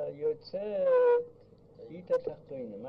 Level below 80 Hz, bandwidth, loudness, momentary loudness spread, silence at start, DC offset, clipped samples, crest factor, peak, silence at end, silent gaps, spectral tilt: -70 dBFS; 5.4 kHz; -30 LUFS; 21 LU; 0 s; under 0.1%; under 0.1%; 14 dB; -18 dBFS; 0 s; none; -7.5 dB/octave